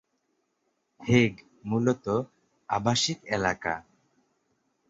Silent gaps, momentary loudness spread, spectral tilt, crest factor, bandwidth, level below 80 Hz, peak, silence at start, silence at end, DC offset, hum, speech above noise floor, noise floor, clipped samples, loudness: none; 14 LU; -5 dB/octave; 22 dB; 8 kHz; -58 dBFS; -8 dBFS; 1 s; 1.1 s; under 0.1%; none; 50 dB; -76 dBFS; under 0.1%; -27 LUFS